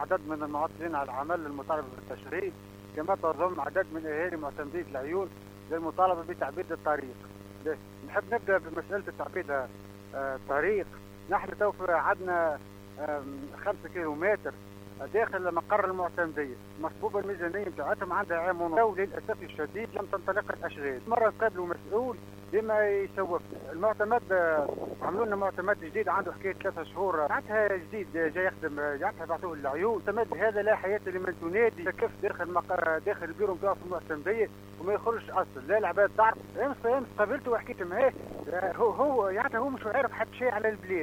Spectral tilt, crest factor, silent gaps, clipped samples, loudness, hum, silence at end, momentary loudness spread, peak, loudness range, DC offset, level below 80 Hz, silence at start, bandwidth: -6.5 dB/octave; 18 dB; none; under 0.1%; -31 LUFS; 50 Hz at -50 dBFS; 0 s; 10 LU; -12 dBFS; 4 LU; under 0.1%; -60 dBFS; 0 s; 17 kHz